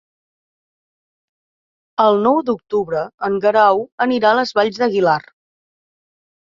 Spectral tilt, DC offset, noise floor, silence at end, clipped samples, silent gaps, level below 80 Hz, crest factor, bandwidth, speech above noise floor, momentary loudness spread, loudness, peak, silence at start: -6 dB/octave; under 0.1%; under -90 dBFS; 1.3 s; under 0.1%; 3.14-3.18 s, 3.92-3.98 s; -64 dBFS; 18 dB; 7.4 kHz; over 74 dB; 8 LU; -16 LUFS; -2 dBFS; 2 s